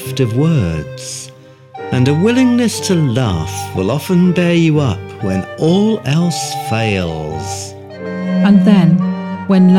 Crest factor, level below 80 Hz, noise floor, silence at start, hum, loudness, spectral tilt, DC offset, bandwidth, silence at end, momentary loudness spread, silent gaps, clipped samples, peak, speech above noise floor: 12 dB; -42 dBFS; -38 dBFS; 0 s; none; -14 LUFS; -6.5 dB/octave; under 0.1%; 15.5 kHz; 0 s; 14 LU; none; under 0.1%; -2 dBFS; 26 dB